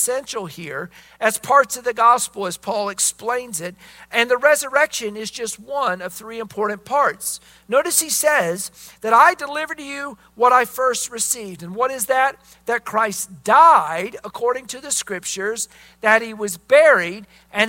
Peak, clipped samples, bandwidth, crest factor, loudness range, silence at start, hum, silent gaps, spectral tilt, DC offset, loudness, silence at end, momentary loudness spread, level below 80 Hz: 0 dBFS; under 0.1%; 16.5 kHz; 20 dB; 3 LU; 0 s; none; none; -1.5 dB/octave; under 0.1%; -19 LUFS; 0 s; 16 LU; -62 dBFS